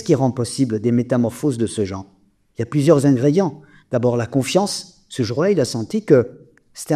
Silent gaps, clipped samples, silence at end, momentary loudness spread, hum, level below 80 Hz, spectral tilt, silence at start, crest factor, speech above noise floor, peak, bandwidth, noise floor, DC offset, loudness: none; under 0.1%; 0 s; 12 LU; none; -56 dBFS; -6.5 dB/octave; 0 s; 18 dB; 21 dB; 0 dBFS; 14.5 kHz; -39 dBFS; under 0.1%; -19 LUFS